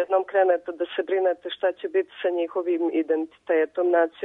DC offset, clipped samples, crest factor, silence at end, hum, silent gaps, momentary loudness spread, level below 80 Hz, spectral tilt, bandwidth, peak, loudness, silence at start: under 0.1%; under 0.1%; 16 dB; 0 s; none; none; 6 LU; -76 dBFS; -5.5 dB/octave; 4 kHz; -8 dBFS; -24 LUFS; 0 s